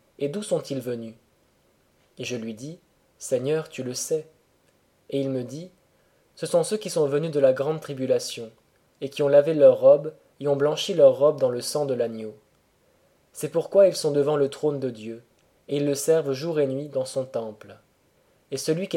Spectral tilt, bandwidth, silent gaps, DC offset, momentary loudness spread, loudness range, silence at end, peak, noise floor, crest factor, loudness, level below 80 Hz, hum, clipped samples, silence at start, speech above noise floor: -5 dB/octave; 16 kHz; none; under 0.1%; 19 LU; 11 LU; 0 s; -6 dBFS; -64 dBFS; 20 dB; -24 LUFS; -74 dBFS; none; under 0.1%; 0.2 s; 41 dB